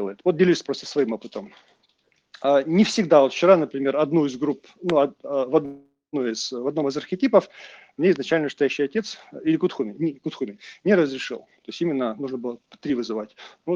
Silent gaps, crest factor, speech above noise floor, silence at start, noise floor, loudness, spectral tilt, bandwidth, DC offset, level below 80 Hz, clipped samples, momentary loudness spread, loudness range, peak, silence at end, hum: none; 20 dB; 44 dB; 0 s; -67 dBFS; -23 LUFS; -5.5 dB/octave; 9.4 kHz; under 0.1%; -70 dBFS; under 0.1%; 16 LU; 6 LU; -2 dBFS; 0 s; none